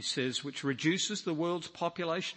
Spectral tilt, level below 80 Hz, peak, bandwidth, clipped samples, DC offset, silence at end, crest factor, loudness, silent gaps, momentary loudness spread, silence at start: -3.5 dB/octave; -78 dBFS; -16 dBFS; 8.8 kHz; under 0.1%; under 0.1%; 0 s; 18 dB; -33 LUFS; none; 5 LU; 0 s